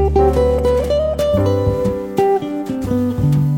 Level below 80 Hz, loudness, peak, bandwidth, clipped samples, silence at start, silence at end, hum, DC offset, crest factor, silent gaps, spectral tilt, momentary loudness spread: -26 dBFS; -17 LUFS; -2 dBFS; 17 kHz; under 0.1%; 0 s; 0 s; none; under 0.1%; 14 dB; none; -8 dB/octave; 6 LU